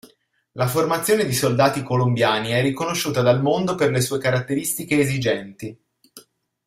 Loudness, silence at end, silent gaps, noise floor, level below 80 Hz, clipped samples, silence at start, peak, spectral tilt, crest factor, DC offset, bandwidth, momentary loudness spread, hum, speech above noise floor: -20 LUFS; 0.45 s; none; -59 dBFS; -56 dBFS; under 0.1%; 0.55 s; -2 dBFS; -5 dB/octave; 18 dB; under 0.1%; 16 kHz; 7 LU; none; 39 dB